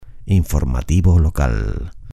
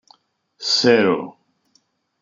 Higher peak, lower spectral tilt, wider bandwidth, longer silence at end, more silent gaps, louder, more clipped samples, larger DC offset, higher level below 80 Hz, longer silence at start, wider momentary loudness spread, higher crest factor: about the same, -2 dBFS vs -2 dBFS; first, -7.5 dB/octave vs -3.5 dB/octave; first, 14 kHz vs 7.6 kHz; second, 0 s vs 0.9 s; neither; about the same, -18 LUFS vs -17 LUFS; neither; neither; first, -22 dBFS vs -68 dBFS; second, 0 s vs 0.6 s; second, 9 LU vs 15 LU; second, 14 dB vs 20 dB